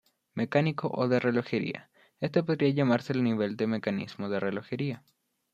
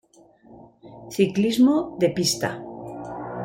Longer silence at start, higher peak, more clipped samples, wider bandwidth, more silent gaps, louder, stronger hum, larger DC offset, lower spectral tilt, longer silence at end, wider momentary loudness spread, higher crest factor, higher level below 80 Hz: second, 0.35 s vs 0.5 s; second, -10 dBFS vs -6 dBFS; neither; second, 7.8 kHz vs 16.5 kHz; neither; second, -29 LUFS vs -22 LUFS; neither; neither; first, -8 dB/octave vs -4.5 dB/octave; first, 0.55 s vs 0 s; second, 9 LU vs 17 LU; about the same, 18 dB vs 18 dB; second, -72 dBFS vs -58 dBFS